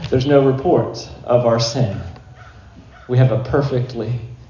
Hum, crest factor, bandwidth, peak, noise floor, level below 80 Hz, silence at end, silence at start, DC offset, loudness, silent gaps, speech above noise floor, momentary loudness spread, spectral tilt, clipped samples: none; 16 dB; 7.2 kHz; -2 dBFS; -41 dBFS; -40 dBFS; 0.05 s; 0 s; under 0.1%; -17 LUFS; none; 25 dB; 12 LU; -7 dB/octave; under 0.1%